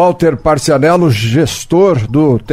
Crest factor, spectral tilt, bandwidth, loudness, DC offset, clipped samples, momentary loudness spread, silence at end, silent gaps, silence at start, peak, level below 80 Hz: 10 dB; -6 dB/octave; 16 kHz; -11 LUFS; under 0.1%; under 0.1%; 3 LU; 0 s; none; 0 s; 0 dBFS; -34 dBFS